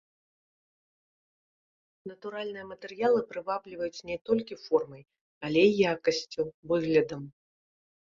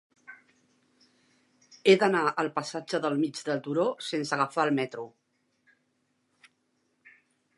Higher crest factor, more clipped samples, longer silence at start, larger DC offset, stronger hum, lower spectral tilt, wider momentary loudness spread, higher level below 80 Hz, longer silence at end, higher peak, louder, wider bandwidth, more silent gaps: about the same, 22 dB vs 24 dB; neither; first, 2.05 s vs 0.3 s; neither; neither; about the same, -5.5 dB/octave vs -5 dB/octave; first, 18 LU vs 11 LU; first, -68 dBFS vs -86 dBFS; second, 0.9 s vs 2.5 s; second, -10 dBFS vs -6 dBFS; about the same, -29 LUFS vs -27 LUFS; second, 7.4 kHz vs 11.5 kHz; first, 4.21-4.25 s, 5.21-5.41 s, 6.54-6.63 s vs none